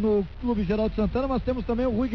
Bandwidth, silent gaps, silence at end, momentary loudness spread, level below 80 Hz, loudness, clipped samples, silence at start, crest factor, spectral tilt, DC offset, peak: 6 kHz; none; 0 s; 3 LU; -36 dBFS; -26 LUFS; under 0.1%; 0 s; 10 dB; -9.5 dB/octave; 0.4%; -14 dBFS